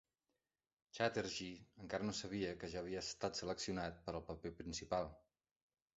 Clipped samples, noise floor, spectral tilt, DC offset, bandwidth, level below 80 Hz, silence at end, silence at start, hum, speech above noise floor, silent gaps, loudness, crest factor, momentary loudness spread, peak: under 0.1%; under -90 dBFS; -3.5 dB/octave; under 0.1%; 8 kHz; -66 dBFS; 0.75 s; 0.95 s; none; over 46 dB; none; -44 LUFS; 24 dB; 9 LU; -22 dBFS